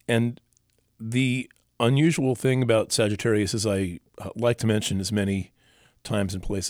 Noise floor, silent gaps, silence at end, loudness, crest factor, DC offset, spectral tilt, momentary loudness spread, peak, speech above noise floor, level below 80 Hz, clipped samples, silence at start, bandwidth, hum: -67 dBFS; none; 0 s; -25 LUFS; 18 dB; under 0.1%; -5.5 dB/octave; 13 LU; -8 dBFS; 43 dB; -50 dBFS; under 0.1%; 0.1 s; 16.5 kHz; none